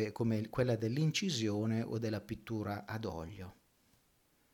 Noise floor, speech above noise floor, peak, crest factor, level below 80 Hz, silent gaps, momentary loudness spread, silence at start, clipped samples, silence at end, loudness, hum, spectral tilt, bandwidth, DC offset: -73 dBFS; 37 dB; -20 dBFS; 16 dB; -64 dBFS; none; 11 LU; 0 s; under 0.1%; 1 s; -36 LUFS; none; -6 dB/octave; 18 kHz; under 0.1%